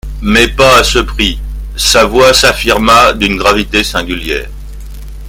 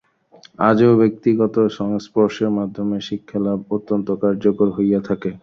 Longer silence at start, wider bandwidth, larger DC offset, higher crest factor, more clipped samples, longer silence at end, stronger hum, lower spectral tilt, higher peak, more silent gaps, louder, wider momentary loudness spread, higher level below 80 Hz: second, 0.05 s vs 0.6 s; first, over 20 kHz vs 6.8 kHz; neither; second, 10 dB vs 16 dB; first, 1% vs under 0.1%; about the same, 0 s vs 0.05 s; neither; second, -3 dB/octave vs -8 dB/octave; about the same, 0 dBFS vs -2 dBFS; neither; first, -8 LUFS vs -19 LUFS; first, 18 LU vs 10 LU; first, -22 dBFS vs -56 dBFS